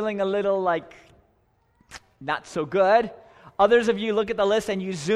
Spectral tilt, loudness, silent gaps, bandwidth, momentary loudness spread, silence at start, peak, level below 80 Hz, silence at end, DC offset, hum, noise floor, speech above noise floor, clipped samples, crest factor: -5 dB/octave; -23 LUFS; none; 12.5 kHz; 11 LU; 0 s; -6 dBFS; -58 dBFS; 0 s; under 0.1%; none; -65 dBFS; 42 dB; under 0.1%; 18 dB